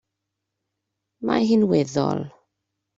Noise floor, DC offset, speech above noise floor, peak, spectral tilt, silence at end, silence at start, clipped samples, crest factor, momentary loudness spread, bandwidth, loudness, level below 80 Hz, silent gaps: -81 dBFS; under 0.1%; 61 dB; -6 dBFS; -6.5 dB/octave; 0.7 s; 1.2 s; under 0.1%; 18 dB; 13 LU; 7.8 kHz; -22 LUFS; -62 dBFS; none